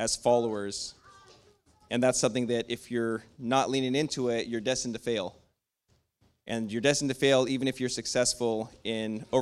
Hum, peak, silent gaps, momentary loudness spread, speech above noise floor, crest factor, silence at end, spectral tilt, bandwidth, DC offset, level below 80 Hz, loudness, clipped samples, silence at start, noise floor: none; -10 dBFS; none; 9 LU; 43 dB; 20 dB; 0 s; -3.5 dB/octave; 14 kHz; under 0.1%; -62 dBFS; -29 LUFS; under 0.1%; 0 s; -72 dBFS